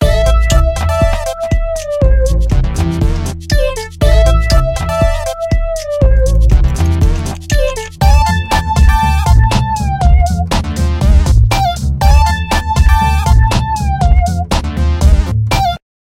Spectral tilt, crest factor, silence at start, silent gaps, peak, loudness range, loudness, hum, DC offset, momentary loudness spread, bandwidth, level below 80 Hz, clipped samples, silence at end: -6 dB/octave; 10 dB; 0 s; none; 0 dBFS; 2 LU; -13 LUFS; none; under 0.1%; 6 LU; 16 kHz; -12 dBFS; 0.2%; 0.25 s